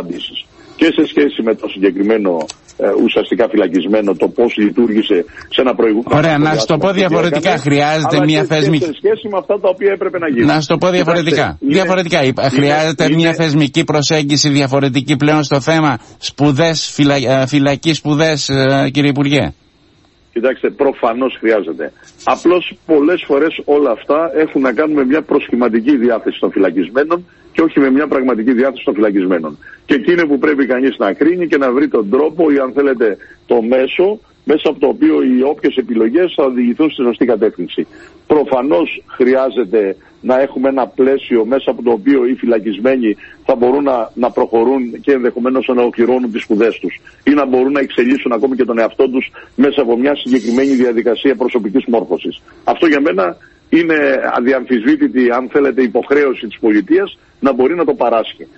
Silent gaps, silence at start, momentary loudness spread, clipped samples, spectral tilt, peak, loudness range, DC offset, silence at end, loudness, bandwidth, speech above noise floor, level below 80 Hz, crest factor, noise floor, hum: none; 0 s; 5 LU; under 0.1%; -5.5 dB/octave; 0 dBFS; 2 LU; under 0.1%; 0.15 s; -13 LUFS; 8.4 kHz; 37 dB; -50 dBFS; 14 dB; -50 dBFS; none